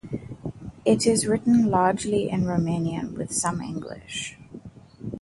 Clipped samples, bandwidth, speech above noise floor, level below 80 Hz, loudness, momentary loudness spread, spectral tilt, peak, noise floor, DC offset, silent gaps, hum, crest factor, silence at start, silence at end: under 0.1%; 11.5 kHz; 21 dB; -52 dBFS; -24 LUFS; 17 LU; -5 dB/octave; -6 dBFS; -44 dBFS; under 0.1%; none; none; 18 dB; 0.05 s; 0.05 s